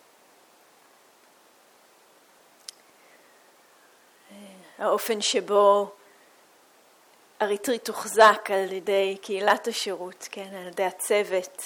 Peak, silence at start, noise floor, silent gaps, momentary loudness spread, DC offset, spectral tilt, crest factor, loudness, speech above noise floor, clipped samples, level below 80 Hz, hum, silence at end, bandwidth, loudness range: -6 dBFS; 4.3 s; -58 dBFS; none; 20 LU; under 0.1%; -2 dB/octave; 22 dB; -24 LUFS; 34 dB; under 0.1%; -80 dBFS; none; 0 s; over 20 kHz; 6 LU